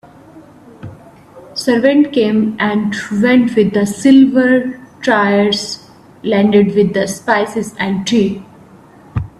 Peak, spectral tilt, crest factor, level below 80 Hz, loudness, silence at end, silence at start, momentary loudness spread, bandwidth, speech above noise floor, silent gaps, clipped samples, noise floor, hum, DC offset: 0 dBFS; -5.5 dB/octave; 14 dB; -46 dBFS; -13 LUFS; 0.15 s; 0.35 s; 15 LU; 13 kHz; 29 dB; none; under 0.1%; -41 dBFS; none; under 0.1%